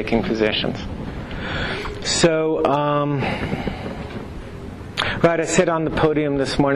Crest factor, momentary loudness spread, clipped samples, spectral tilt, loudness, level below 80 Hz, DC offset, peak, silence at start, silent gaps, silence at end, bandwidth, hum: 16 dB; 14 LU; under 0.1%; -4.5 dB/octave; -21 LUFS; -38 dBFS; under 0.1%; -6 dBFS; 0 s; none; 0 s; 12.5 kHz; none